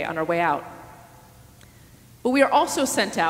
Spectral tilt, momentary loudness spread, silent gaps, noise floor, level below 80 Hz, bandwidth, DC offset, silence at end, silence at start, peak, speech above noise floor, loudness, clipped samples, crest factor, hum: -3.5 dB/octave; 14 LU; none; -50 dBFS; -58 dBFS; 16 kHz; under 0.1%; 0 s; 0 s; -4 dBFS; 28 dB; -22 LUFS; under 0.1%; 20 dB; none